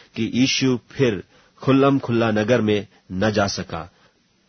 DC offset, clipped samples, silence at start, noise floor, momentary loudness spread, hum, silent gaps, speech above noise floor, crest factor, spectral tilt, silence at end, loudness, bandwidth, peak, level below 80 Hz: under 0.1%; under 0.1%; 0.15 s; -59 dBFS; 12 LU; none; none; 39 dB; 18 dB; -5.5 dB/octave; 0.6 s; -20 LUFS; 6.6 kHz; -4 dBFS; -52 dBFS